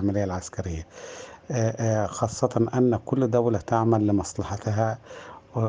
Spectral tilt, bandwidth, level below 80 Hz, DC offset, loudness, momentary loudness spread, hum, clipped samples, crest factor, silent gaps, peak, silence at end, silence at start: -7 dB/octave; 9.8 kHz; -54 dBFS; under 0.1%; -25 LUFS; 17 LU; none; under 0.1%; 20 dB; none; -6 dBFS; 0 s; 0 s